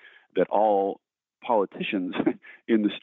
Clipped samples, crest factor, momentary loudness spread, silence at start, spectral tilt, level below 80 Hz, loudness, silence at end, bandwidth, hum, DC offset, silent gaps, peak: under 0.1%; 16 dB; 14 LU; 0.35 s; -4.5 dB/octave; -72 dBFS; -26 LUFS; 0 s; 4.1 kHz; none; under 0.1%; none; -10 dBFS